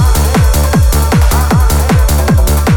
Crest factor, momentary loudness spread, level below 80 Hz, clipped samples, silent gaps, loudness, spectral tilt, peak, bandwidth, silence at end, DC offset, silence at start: 8 dB; 0 LU; -10 dBFS; under 0.1%; none; -10 LUFS; -5.5 dB/octave; 0 dBFS; 19.5 kHz; 0 s; under 0.1%; 0 s